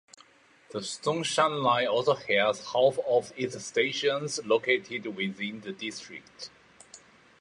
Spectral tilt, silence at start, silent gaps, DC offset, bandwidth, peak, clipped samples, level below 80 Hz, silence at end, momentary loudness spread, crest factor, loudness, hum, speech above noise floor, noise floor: -3.5 dB/octave; 0.7 s; none; under 0.1%; 11.5 kHz; -8 dBFS; under 0.1%; -74 dBFS; 0.45 s; 15 LU; 22 dB; -28 LUFS; none; 31 dB; -59 dBFS